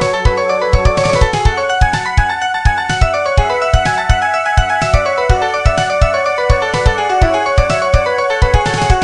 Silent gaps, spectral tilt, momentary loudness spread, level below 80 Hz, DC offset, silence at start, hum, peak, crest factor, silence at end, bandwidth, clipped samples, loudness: none; -5 dB/octave; 2 LU; -18 dBFS; under 0.1%; 0 s; none; 0 dBFS; 12 dB; 0 s; 11 kHz; 0.2%; -13 LUFS